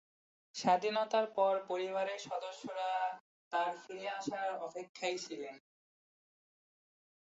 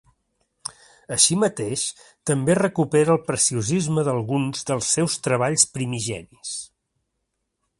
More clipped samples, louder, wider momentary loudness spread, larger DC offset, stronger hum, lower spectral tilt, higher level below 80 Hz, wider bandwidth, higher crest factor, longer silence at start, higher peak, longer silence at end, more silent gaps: neither; second, -37 LUFS vs -21 LUFS; about the same, 12 LU vs 14 LU; neither; neither; second, -2 dB/octave vs -4 dB/octave; second, -90 dBFS vs -58 dBFS; second, 8 kHz vs 11.5 kHz; about the same, 20 dB vs 22 dB; about the same, 0.55 s vs 0.65 s; second, -18 dBFS vs -2 dBFS; first, 1.7 s vs 1.15 s; first, 3.20-3.51 s, 4.89-4.95 s vs none